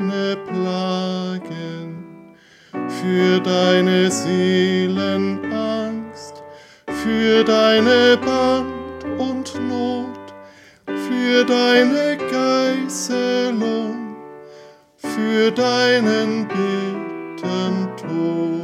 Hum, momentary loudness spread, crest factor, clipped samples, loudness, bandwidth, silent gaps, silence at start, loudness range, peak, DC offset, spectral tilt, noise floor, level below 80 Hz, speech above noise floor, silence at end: none; 16 LU; 18 dB; under 0.1%; -19 LUFS; 14.5 kHz; none; 0 s; 4 LU; -2 dBFS; under 0.1%; -5 dB/octave; -47 dBFS; -58 dBFS; 30 dB; 0 s